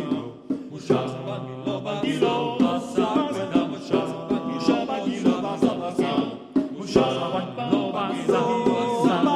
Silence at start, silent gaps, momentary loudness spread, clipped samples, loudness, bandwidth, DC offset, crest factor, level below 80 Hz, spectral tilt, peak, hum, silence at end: 0 s; none; 8 LU; under 0.1%; -24 LUFS; 11.5 kHz; under 0.1%; 20 dB; -58 dBFS; -6 dB/octave; -4 dBFS; none; 0 s